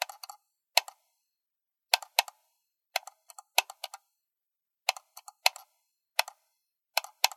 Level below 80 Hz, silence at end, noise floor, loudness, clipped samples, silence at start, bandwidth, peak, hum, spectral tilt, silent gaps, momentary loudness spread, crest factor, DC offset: under -90 dBFS; 0.1 s; -88 dBFS; -30 LUFS; under 0.1%; 0 s; 16.5 kHz; -2 dBFS; none; 7 dB/octave; none; 20 LU; 34 dB; under 0.1%